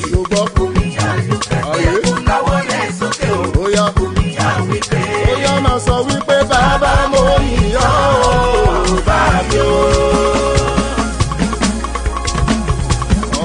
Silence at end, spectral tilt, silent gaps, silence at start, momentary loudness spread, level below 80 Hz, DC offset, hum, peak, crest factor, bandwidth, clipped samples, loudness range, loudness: 0 s; -5 dB/octave; none; 0 s; 5 LU; -20 dBFS; under 0.1%; none; 0 dBFS; 14 dB; 10.5 kHz; under 0.1%; 3 LU; -14 LUFS